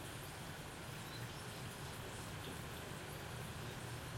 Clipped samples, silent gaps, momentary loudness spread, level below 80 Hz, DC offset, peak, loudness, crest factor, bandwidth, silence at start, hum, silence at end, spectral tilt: under 0.1%; none; 1 LU; -62 dBFS; under 0.1%; -34 dBFS; -48 LUFS; 14 dB; 16.5 kHz; 0 s; none; 0 s; -4 dB/octave